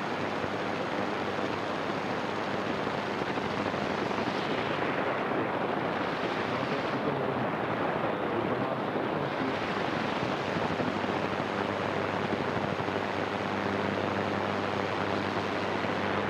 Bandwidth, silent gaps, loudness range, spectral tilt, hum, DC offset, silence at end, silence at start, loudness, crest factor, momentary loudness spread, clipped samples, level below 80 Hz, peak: 14 kHz; none; 1 LU; -6 dB/octave; none; under 0.1%; 0 s; 0 s; -31 LUFS; 16 dB; 2 LU; under 0.1%; -62 dBFS; -14 dBFS